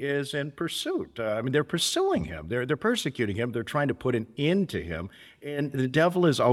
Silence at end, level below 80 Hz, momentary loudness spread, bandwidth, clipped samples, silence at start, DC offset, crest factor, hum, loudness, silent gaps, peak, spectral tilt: 0 s; -54 dBFS; 9 LU; 16 kHz; under 0.1%; 0 s; under 0.1%; 20 dB; none; -28 LUFS; none; -8 dBFS; -5 dB/octave